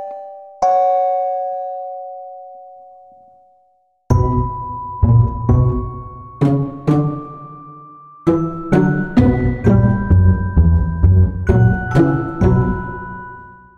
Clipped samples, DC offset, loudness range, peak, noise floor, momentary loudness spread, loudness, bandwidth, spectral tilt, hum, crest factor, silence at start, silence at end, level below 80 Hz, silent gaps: under 0.1%; under 0.1%; 9 LU; 0 dBFS; -59 dBFS; 19 LU; -16 LUFS; 6.8 kHz; -10 dB/octave; none; 16 dB; 0 s; 0.25 s; -26 dBFS; none